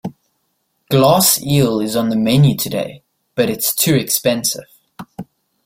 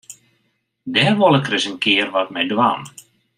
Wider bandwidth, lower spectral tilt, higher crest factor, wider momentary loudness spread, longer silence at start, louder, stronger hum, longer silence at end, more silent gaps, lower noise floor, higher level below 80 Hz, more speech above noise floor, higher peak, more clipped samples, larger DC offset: about the same, 16.5 kHz vs 15 kHz; about the same, -4.5 dB/octave vs -4.5 dB/octave; about the same, 16 dB vs 18 dB; first, 19 LU vs 12 LU; about the same, 0.05 s vs 0.1 s; about the same, -15 LUFS vs -17 LUFS; neither; about the same, 0.45 s vs 0.5 s; neither; about the same, -67 dBFS vs -68 dBFS; first, -50 dBFS vs -66 dBFS; about the same, 53 dB vs 50 dB; about the same, 0 dBFS vs -2 dBFS; neither; neither